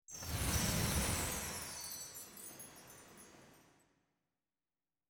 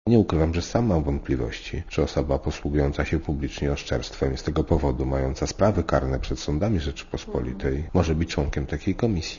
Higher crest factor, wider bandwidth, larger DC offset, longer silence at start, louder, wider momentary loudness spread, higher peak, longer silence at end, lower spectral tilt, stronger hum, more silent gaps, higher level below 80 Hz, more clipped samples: about the same, 20 dB vs 18 dB; first, over 20 kHz vs 7.4 kHz; neither; about the same, 0.1 s vs 0.05 s; second, -39 LUFS vs -25 LUFS; first, 21 LU vs 7 LU; second, -22 dBFS vs -6 dBFS; first, 1.5 s vs 0 s; second, -3 dB/octave vs -6.5 dB/octave; neither; neither; second, -52 dBFS vs -32 dBFS; neither